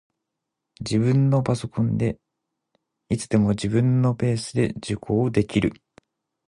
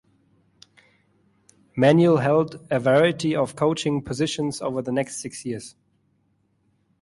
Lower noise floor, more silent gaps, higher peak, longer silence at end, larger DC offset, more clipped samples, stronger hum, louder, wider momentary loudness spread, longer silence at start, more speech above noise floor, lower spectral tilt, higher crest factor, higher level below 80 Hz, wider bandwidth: first, -82 dBFS vs -67 dBFS; neither; about the same, -6 dBFS vs -6 dBFS; second, 0.75 s vs 1.3 s; neither; neither; neither; about the same, -23 LUFS vs -22 LUFS; second, 9 LU vs 14 LU; second, 0.8 s vs 1.75 s; first, 61 dB vs 46 dB; about the same, -7 dB/octave vs -6 dB/octave; about the same, 18 dB vs 18 dB; first, -48 dBFS vs -60 dBFS; about the same, 11 kHz vs 11.5 kHz